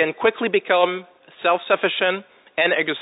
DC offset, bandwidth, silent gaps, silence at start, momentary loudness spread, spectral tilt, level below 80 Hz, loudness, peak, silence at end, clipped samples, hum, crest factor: under 0.1%; 4 kHz; none; 0 s; 9 LU; -8.5 dB/octave; -72 dBFS; -20 LUFS; -2 dBFS; 0 s; under 0.1%; none; 18 dB